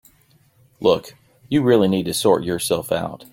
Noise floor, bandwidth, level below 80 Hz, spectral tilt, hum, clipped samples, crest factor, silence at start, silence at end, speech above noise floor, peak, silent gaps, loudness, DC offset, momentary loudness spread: -57 dBFS; 17 kHz; -54 dBFS; -5 dB/octave; none; under 0.1%; 18 dB; 0.8 s; 0.1 s; 38 dB; -2 dBFS; none; -19 LUFS; under 0.1%; 7 LU